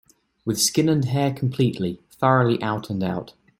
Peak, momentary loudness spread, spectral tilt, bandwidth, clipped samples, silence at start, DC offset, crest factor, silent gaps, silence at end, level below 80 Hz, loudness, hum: -4 dBFS; 10 LU; -5 dB/octave; 16.5 kHz; under 0.1%; 0.45 s; under 0.1%; 20 dB; none; 0.3 s; -58 dBFS; -22 LUFS; none